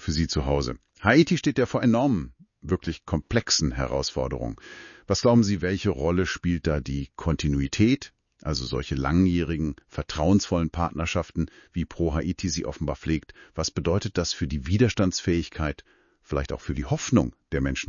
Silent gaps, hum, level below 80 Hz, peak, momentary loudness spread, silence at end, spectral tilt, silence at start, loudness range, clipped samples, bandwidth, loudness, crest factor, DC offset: none; none; -38 dBFS; -6 dBFS; 10 LU; 0.05 s; -5.5 dB/octave; 0 s; 4 LU; under 0.1%; 7.4 kHz; -26 LUFS; 20 dB; under 0.1%